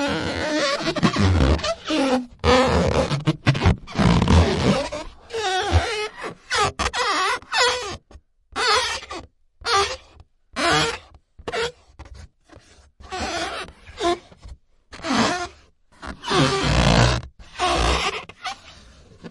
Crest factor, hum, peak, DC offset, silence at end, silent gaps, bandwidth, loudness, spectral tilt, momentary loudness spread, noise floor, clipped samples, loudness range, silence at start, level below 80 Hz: 18 dB; none; -4 dBFS; under 0.1%; 0 s; none; 11.5 kHz; -21 LUFS; -4.5 dB/octave; 16 LU; -53 dBFS; under 0.1%; 7 LU; 0 s; -34 dBFS